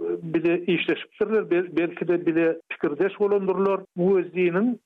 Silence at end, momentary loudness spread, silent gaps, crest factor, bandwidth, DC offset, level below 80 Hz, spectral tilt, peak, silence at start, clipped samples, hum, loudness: 0.1 s; 4 LU; none; 12 dB; 4.2 kHz; under 0.1%; -70 dBFS; -9 dB/octave; -12 dBFS; 0 s; under 0.1%; none; -24 LUFS